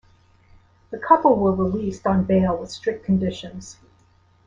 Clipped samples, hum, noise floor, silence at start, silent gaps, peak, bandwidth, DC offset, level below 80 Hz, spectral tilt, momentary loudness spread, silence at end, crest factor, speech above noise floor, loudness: under 0.1%; none; -57 dBFS; 0.9 s; none; -2 dBFS; 7.6 kHz; under 0.1%; -48 dBFS; -7.5 dB/octave; 20 LU; 0.75 s; 20 dB; 37 dB; -20 LUFS